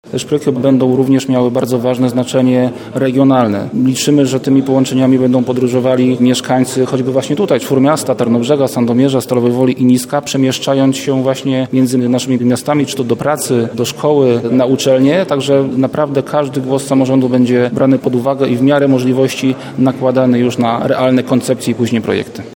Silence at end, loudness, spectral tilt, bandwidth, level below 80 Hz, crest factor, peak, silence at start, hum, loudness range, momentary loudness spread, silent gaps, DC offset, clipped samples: 0.05 s; -12 LUFS; -6 dB/octave; 17.5 kHz; -56 dBFS; 12 dB; 0 dBFS; 0.05 s; none; 1 LU; 4 LU; none; under 0.1%; under 0.1%